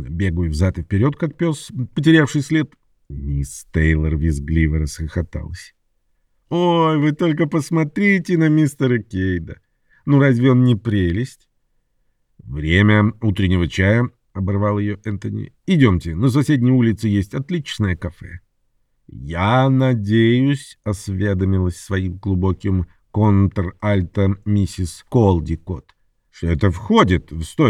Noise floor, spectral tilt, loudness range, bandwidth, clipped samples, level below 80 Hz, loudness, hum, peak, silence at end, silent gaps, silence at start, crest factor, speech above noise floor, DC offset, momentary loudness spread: -65 dBFS; -7 dB/octave; 3 LU; 12.5 kHz; under 0.1%; -34 dBFS; -18 LUFS; none; -2 dBFS; 0 s; none; 0 s; 16 dB; 47 dB; under 0.1%; 12 LU